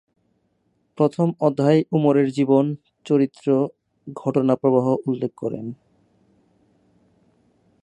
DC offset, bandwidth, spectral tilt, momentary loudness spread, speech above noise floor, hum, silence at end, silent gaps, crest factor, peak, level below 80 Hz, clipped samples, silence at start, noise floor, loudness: under 0.1%; 9.2 kHz; -8.5 dB/octave; 11 LU; 48 dB; none; 2.1 s; none; 18 dB; -4 dBFS; -68 dBFS; under 0.1%; 1 s; -68 dBFS; -21 LUFS